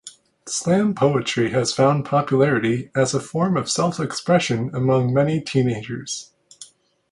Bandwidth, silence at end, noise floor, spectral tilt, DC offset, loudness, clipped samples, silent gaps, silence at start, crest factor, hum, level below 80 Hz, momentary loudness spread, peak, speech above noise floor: 11.5 kHz; 0.45 s; -47 dBFS; -5.5 dB/octave; under 0.1%; -20 LUFS; under 0.1%; none; 0.05 s; 18 dB; none; -56 dBFS; 8 LU; -2 dBFS; 27 dB